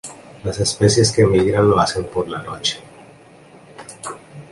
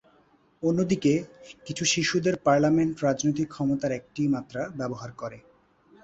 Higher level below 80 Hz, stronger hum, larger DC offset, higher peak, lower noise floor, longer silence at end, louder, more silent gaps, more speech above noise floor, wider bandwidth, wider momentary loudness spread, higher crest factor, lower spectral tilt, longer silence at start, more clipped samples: first, -42 dBFS vs -60 dBFS; neither; neither; first, -2 dBFS vs -8 dBFS; second, -45 dBFS vs -62 dBFS; second, 0.1 s vs 0.65 s; first, -17 LUFS vs -26 LUFS; neither; second, 28 dB vs 36 dB; first, 11.5 kHz vs 8.2 kHz; first, 21 LU vs 15 LU; about the same, 18 dB vs 18 dB; about the same, -5 dB/octave vs -5 dB/octave; second, 0.05 s vs 0.6 s; neither